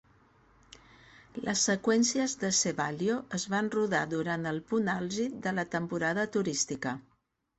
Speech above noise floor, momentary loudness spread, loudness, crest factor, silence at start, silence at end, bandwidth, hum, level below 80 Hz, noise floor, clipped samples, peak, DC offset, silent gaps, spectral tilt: 33 dB; 7 LU; -30 LUFS; 16 dB; 1.35 s; 0.6 s; 8.4 kHz; none; -66 dBFS; -63 dBFS; under 0.1%; -14 dBFS; under 0.1%; none; -3.5 dB/octave